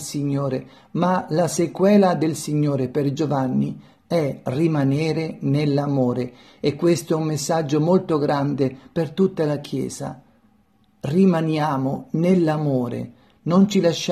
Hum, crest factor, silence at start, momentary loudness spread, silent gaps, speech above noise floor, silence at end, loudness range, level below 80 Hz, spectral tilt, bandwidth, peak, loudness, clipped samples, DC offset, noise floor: none; 16 dB; 0 s; 10 LU; none; 39 dB; 0 s; 3 LU; -60 dBFS; -6.5 dB/octave; 13.5 kHz; -6 dBFS; -21 LUFS; under 0.1%; under 0.1%; -60 dBFS